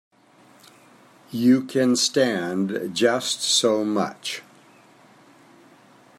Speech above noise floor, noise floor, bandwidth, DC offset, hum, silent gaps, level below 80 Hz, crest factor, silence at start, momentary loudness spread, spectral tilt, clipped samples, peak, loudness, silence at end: 33 dB; -54 dBFS; 15 kHz; under 0.1%; none; none; -74 dBFS; 20 dB; 1.3 s; 11 LU; -3.5 dB/octave; under 0.1%; -4 dBFS; -21 LUFS; 1.8 s